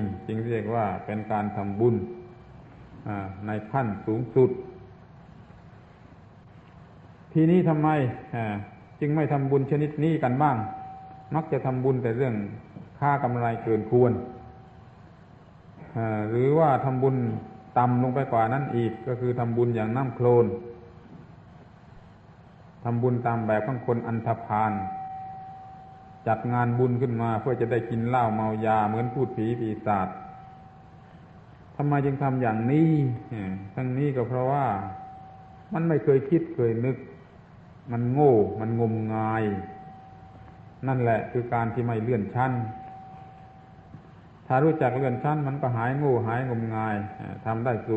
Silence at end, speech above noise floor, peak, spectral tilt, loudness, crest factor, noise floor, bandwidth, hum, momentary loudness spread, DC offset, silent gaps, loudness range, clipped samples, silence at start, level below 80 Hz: 0 s; 26 dB; -8 dBFS; -10.5 dB/octave; -26 LUFS; 18 dB; -50 dBFS; 4.3 kHz; none; 18 LU; under 0.1%; none; 5 LU; under 0.1%; 0 s; -56 dBFS